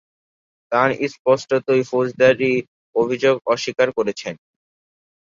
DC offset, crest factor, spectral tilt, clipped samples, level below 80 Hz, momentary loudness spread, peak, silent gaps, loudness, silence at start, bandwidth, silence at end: under 0.1%; 18 dB; -5 dB/octave; under 0.1%; -62 dBFS; 8 LU; -2 dBFS; 1.19-1.25 s, 2.68-2.93 s; -19 LUFS; 0.7 s; 7.6 kHz; 0.85 s